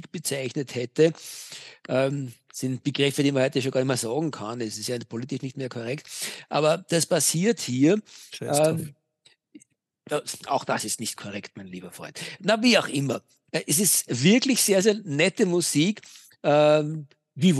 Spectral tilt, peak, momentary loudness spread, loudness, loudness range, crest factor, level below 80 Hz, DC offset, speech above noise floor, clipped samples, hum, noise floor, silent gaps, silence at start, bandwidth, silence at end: -4 dB/octave; -6 dBFS; 17 LU; -24 LUFS; 7 LU; 18 dB; -78 dBFS; under 0.1%; 38 dB; under 0.1%; none; -63 dBFS; none; 0.15 s; 12.5 kHz; 0 s